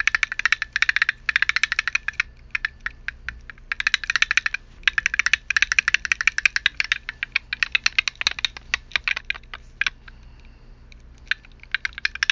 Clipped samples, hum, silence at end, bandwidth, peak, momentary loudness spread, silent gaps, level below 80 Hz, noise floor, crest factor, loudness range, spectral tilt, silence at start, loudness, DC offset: under 0.1%; none; 0.05 s; 7.6 kHz; 0 dBFS; 10 LU; none; -46 dBFS; -45 dBFS; 24 dB; 8 LU; 1 dB/octave; 0 s; -22 LUFS; under 0.1%